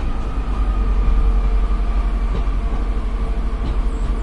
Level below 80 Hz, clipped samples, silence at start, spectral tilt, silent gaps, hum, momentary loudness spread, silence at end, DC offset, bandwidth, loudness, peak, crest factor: -18 dBFS; under 0.1%; 0 s; -7.5 dB/octave; none; none; 5 LU; 0 s; under 0.1%; 5 kHz; -22 LUFS; -6 dBFS; 12 dB